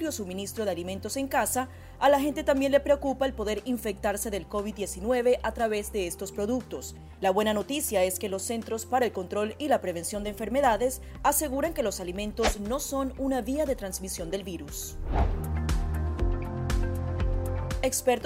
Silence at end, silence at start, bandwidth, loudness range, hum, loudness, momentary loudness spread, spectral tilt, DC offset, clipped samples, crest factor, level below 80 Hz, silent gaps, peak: 0 s; 0 s; 16 kHz; 4 LU; none; -29 LUFS; 8 LU; -4.5 dB/octave; under 0.1%; under 0.1%; 18 dB; -38 dBFS; none; -10 dBFS